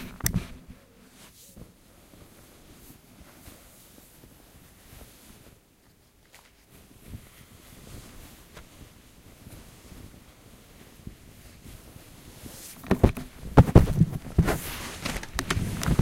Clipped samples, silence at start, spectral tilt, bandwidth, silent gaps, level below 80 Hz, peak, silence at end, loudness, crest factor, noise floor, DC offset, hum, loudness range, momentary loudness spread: under 0.1%; 0 s; -6 dB/octave; 16 kHz; none; -38 dBFS; 0 dBFS; 0 s; -25 LUFS; 30 dB; -60 dBFS; under 0.1%; none; 26 LU; 27 LU